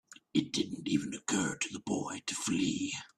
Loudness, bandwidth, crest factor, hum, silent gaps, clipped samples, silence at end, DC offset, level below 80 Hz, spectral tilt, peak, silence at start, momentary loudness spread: -34 LUFS; 13.5 kHz; 20 dB; none; none; under 0.1%; 0.1 s; under 0.1%; -70 dBFS; -3.5 dB/octave; -14 dBFS; 0.1 s; 4 LU